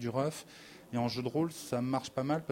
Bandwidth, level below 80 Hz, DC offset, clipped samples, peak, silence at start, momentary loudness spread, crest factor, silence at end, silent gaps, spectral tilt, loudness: 16 kHz; -68 dBFS; under 0.1%; under 0.1%; -18 dBFS; 0 s; 12 LU; 16 dB; 0 s; none; -6 dB/octave; -35 LUFS